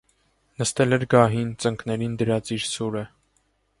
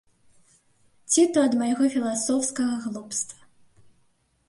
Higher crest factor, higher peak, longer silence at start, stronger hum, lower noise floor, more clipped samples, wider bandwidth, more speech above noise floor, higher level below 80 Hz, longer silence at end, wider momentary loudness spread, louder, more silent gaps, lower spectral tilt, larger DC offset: about the same, 22 dB vs 18 dB; first, -2 dBFS vs -10 dBFS; second, 0.6 s vs 1.1 s; neither; about the same, -68 dBFS vs -67 dBFS; neither; about the same, 11.5 kHz vs 11.5 kHz; about the same, 45 dB vs 43 dB; first, -54 dBFS vs -72 dBFS; second, 0.75 s vs 1.15 s; about the same, 10 LU vs 10 LU; about the same, -23 LUFS vs -24 LUFS; neither; first, -5 dB/octave vs -3 dB/octave; neither